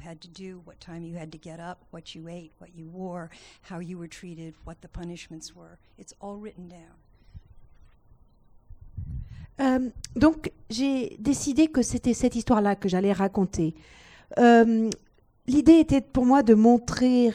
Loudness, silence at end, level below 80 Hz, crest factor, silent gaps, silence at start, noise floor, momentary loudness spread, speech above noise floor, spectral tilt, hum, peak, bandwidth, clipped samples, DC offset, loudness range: -22 LUFS; 0 s; -48 dBFS; 20 dB; none; 0.05 s; -57 dBFS; 25 LU; 32 dB; -6 dB/octave; none; -6 dBFS; 11 kHz; under 0.1%; under 0.1%; 22 LU